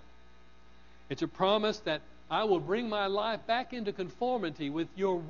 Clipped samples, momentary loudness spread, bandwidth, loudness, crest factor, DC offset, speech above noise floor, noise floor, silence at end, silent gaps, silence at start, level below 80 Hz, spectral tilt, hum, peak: under 0.1%; 9 LU; 7.2 kHz; -32 LUFS; 18 dB; 0.2%; 28 dB; -59 dBFS; 0 s; none; 1.1 s; -62 dBFS; -3 dB/octave; none; -14 dBFS